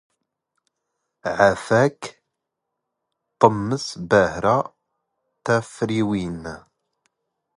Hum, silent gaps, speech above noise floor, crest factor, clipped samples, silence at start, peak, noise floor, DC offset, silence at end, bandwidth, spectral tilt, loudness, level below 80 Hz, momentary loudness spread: none; none; 61 dB; 22 dB; under 0.1%; 1.25 s; 0 dBFS; -81 dBFS; under 0.1%; 1 s; 11.5 kHz; -6 dB/octave; -21 LUFS; -52 dBFS; 16 LU